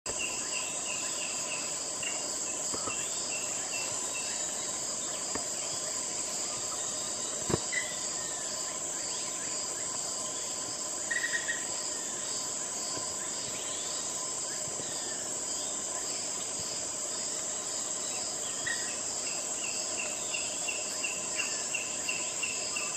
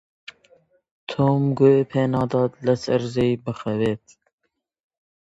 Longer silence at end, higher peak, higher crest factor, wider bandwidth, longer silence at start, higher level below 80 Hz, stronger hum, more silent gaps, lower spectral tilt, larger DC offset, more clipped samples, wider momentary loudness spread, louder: second, 0 s vs 1.25 s; second, -14 dBFS vs -4 dBFS; about the same, 22 dB vs 18 dB; first, 15 kHz vs 8 kHz; second, 0.05 s vs 1.1 s; second, -66 dBFS vs -56 dBFS; neither; neither; second, 0 dB/octave vs -8 dB/octave; neither; neither; second, 2 LU vs 10 LU; second, -32 LUFS vs -21 LUFS